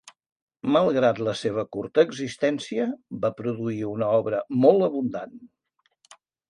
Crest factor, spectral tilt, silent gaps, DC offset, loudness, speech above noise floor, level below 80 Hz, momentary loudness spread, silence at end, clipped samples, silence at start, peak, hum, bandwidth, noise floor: 20 dB; -6.5 dB/octave; 0.32-0.36 s, 0.42-0.47 s; under 0.1%; -24 LUFS; 48 dB; -66 dBFS; 10 LU; 1.05 s; under 0.1%; 0.05 s; -4 dBFS; none; 11 kHz; -72 dBFS